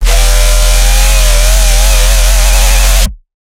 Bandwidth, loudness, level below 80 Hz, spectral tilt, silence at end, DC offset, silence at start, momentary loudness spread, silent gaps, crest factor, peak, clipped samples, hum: 16.5 kHz; -9 LUFS; -6 dBFS; -2 dB/octave; 0.35 s; under 0.1%; 0 s; 1 LU; none; 6 dB; 0 dBFS; 0.9%; none